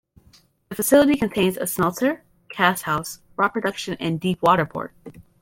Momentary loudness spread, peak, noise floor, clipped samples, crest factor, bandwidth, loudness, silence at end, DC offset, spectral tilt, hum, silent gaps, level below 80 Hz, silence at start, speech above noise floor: 16 LU; -4 dBFS; -56 dBFS; under 0.1%; 20 dB; 16.5 kHz; -21 LUFS; 0.2 s; under 0.1%; -4.5 dB/octave; none; none; -54 dBFS; 0.7 s; 35 dB